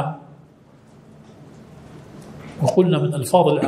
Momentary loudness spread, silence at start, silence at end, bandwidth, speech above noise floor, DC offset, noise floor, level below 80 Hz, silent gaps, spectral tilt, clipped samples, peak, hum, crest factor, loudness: 25 LU; 0 s; 0 s; 15.5 kHz; 32 dB; under 0.1%; -49 dBFS; -58 dBFS; none; -7 dB/octave; under 0.1%; -2 dBFS; none; 20 dB; -19 LUFS